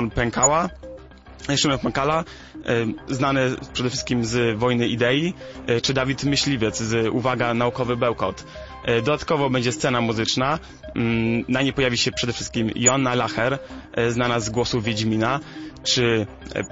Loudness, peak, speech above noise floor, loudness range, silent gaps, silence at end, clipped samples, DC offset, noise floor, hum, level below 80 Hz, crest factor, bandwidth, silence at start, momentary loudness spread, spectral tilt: -22 LUFS; -2 dBFS; 19 dB; 1 LU; none; 0 s; under 0.1%; under 0.1%; -42 dBFS; none; -44 dBFS; 20 dB; 8 kHz; 0 s; 10 LU; -4 dB/octave